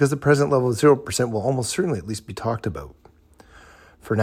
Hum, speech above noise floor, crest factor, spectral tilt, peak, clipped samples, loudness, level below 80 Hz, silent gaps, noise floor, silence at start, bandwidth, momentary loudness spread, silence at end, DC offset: none; 30 dB; 18 dB; -5.5 dB/octave; -4 dBFS; under 0.1%; -22 LUFS; -50 dBFS; none; -51 dBFS; 0 s; 15.5 kHz; 11 LU; 0 s; under 0.1%